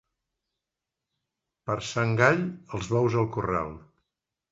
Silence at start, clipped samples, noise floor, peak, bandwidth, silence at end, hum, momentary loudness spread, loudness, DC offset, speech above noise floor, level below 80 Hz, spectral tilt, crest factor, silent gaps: 1.65 s; under 0.1%; -87 dBFS; -4 dBFS; 8 kHz; 0.7 s; none; 13 LU; -26 LUFS; under 0.1%; 61 dB; -54 dBFS; -6 dB/octave; 24 dB; none